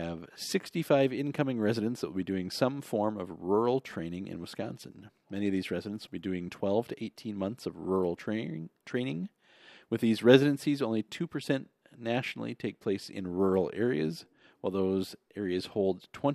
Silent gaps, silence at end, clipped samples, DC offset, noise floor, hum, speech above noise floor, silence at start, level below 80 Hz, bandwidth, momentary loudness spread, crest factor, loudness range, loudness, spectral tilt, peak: none; 0 s; under 0.1%; under 0.1%; -58 dBFS; none; 27 dB; 0 s; -74 dBFS; 14.5 kHz; 12 LU; 26 dB; 6 LU; -32 LUFS; -6.5 dB/octave; -6 dBFS